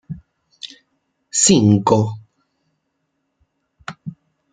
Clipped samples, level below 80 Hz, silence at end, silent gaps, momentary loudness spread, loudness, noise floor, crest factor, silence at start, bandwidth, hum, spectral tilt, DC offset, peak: under 0.1%; -56 dBFS; 0.45 s; none; 24 LU; -15 LUFS; -72 dBFS; 20 dB; 0.1 s; 9.6 kHz; none; -4.5 dB/octave; under 0.1%; -2 dBFS